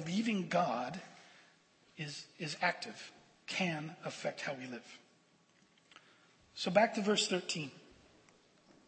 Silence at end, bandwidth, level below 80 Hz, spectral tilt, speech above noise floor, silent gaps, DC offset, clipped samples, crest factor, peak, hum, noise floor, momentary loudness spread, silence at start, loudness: 1.05 s; 8.4 kHz; -82 dBFS; -4 dB/octave; 33 dB; none; under 0.1%; under 0.1%; 24 dB; -14 dBFS; none; -69 dBFS; 22 LU; 0 s; -36 LUFS